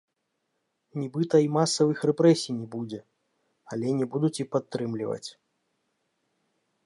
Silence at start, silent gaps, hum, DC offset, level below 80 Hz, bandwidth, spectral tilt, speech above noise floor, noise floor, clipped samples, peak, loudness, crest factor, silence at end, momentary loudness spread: 0.95 s; none; none; under 0.1%; -76 dBFS; 11.5 kHz; -6 dB/octave; 53 dB; -79 dBFS; under 0.1%; -8 dBFS; -26 LUFS; 20 dB; 1.55 s; 16 LU